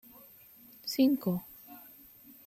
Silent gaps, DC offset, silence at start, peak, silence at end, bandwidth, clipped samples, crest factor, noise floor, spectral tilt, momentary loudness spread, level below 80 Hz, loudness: none; under 0.1%; 0.85 s; -16 dBFS; 0.65 s; 16 kHz; under 0.1%; 18 dB; -56 dBFS; -6 dB/octave; 25 LU; -74 dBFS; -31 LUFS